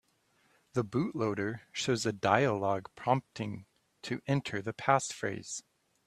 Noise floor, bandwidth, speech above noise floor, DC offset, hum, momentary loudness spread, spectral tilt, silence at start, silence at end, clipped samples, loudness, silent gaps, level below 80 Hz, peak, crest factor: -71 dBFS; 13.5 kHz; 39 dB; under 0.1%; none; 12 LU; -5 dB/octave; 0.75 s; 0.45 s; under 0.1%; -33 LUFS; none; -70 dBFS; -8 dBFS; 24 dB